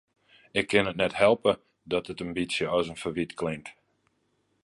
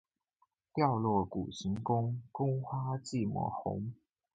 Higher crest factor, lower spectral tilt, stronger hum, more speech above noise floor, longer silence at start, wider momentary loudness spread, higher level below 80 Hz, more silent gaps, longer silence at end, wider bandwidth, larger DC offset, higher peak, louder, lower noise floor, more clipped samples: about the same, 22 dB vs 20 dB; second, -5 dB/octave vs -7.5 dB/octave; neither; about the same, 45 dB vs 43 dB; second, 0.55 s vs 0.75 s; first, 11 LU vs 7 LU; about the same, -58 dBFS vs -62 dBFS; neither; first, 0.9 s vs 0.4 s; first, 11.5 kHz vs 9 kHz; neither; first, -6 dBFS vs -16 dBFS; first, -27 LUFS vs -35 LUFS; second, -73 dBFS vs -77 dBFS; neither